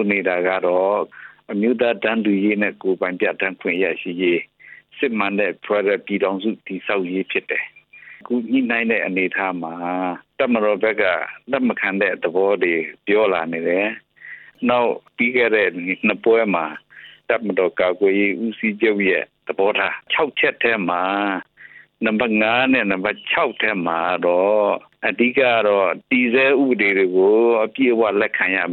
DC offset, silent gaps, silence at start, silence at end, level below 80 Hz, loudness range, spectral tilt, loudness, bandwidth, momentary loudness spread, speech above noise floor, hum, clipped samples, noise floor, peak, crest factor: under 0.1%; none; 0 s; 0 s; -66 dBFS; 5 LU; -9 dB/octave; -19 LUFS; 4.3 kHz; 8 LU; 27 dB; none; under 0.1%; -45 dBFS; -4 dBFS; 16 dB